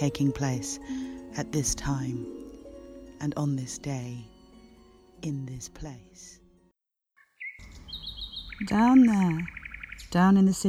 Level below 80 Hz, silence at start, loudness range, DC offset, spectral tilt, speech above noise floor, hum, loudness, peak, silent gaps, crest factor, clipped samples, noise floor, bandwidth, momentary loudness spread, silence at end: -50 dBFS; 0 s; 15 LU; under 0.1%; -5.5 dB/octave; 49 dB; none; -27 LUFS; -10 dBFS; none; 18 dB; under 0.1%; -75 dBFS; 14.5 kHz; 25 LU; 0 s